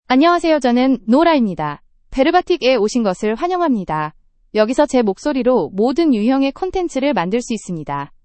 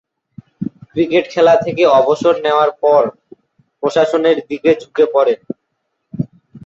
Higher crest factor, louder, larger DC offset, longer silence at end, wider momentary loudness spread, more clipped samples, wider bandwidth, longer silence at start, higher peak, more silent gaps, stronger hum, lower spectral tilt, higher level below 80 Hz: about the same, 16 dB vs 14 dB; about the same, -16 LUFS vs -14 LUFS; neither; about the same, 0.2 s vs 0.1 s; second, 11 LU vs 15 LU; neither; first, 8.8 kHz vs 7.8 kHz; second, 0.1 s vs 0.6 s; about the same, 0 dBFS vs -2 dBFS; neither; neither; about the same, -5.5 dB/octave vs -6 dB/octave; first, -44 dBFS vs -58 dBFS